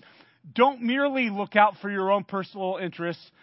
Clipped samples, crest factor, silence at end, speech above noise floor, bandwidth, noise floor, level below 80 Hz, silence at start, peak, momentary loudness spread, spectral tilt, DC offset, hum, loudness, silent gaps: under 0.1%; 22 dB; 0.25 s; 27 dB; 5.8 kHz; -52 dBFS; -80 dBFS; 0.45 s; -4 dBFS; 12 LU; -9.5 dB/octave; under 0.1%; none; -25 LUFS; none